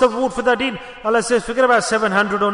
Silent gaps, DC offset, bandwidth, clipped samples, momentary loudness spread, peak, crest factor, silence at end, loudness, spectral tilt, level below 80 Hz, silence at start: none; under 0.1%; 11 kHz; under 0.1%; 5 LU; -2 dBFS; 14 dB; 0 s; -17 LUFS; -3.5 dB/octave; -46 dBFS; 0 s